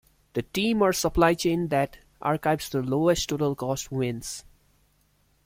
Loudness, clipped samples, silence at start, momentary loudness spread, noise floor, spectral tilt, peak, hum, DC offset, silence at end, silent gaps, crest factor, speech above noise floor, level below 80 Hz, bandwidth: -26 LUFS; under 0.1%; 0.35 s; 11 LU; -66 dBFS; -5 dB/octave; -6 dBFS; none; under 0.1%; 1.05 s; none; 20 dB; 41 dB; -48 dBFS; 16.5 kHz